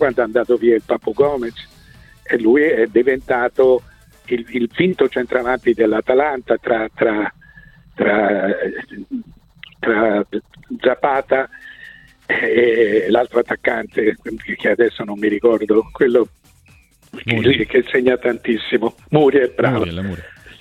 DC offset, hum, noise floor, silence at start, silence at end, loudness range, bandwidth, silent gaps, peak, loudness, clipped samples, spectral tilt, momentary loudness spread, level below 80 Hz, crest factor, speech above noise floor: under 0.1%; none; -50 dBFS; 0 s; 0.1 s; 3 LU; 9.4 kHz; none; 0 dBFS; -17 LUFS; under 0.1%; -7.5 dB/octave; 13 LU; -48 dBFS; 18 dB; 34 dB